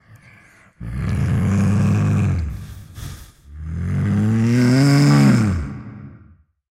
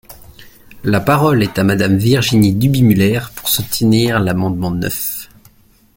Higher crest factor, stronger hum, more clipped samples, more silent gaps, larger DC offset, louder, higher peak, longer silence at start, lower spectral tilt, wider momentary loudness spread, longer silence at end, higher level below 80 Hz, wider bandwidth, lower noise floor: about the same, 12 dB vs 14 dB; neither; neither; neither; neither; second, -17 LUFS vs -14 LUFS; second, -6 dBFS vs 0 dBFS; first, 0.8 s vs 0.1 s; first, -7 dB/octave vs -5.5 dB/octave; first, 22 LU vs 7 LU; about the same, 0.6 s vs 0.7 s; about the same, -36 dBFS vs -40 dBFS; second, 15 kHz vs 17 kHz; about the same, -50 dBFS vs -49 dBFS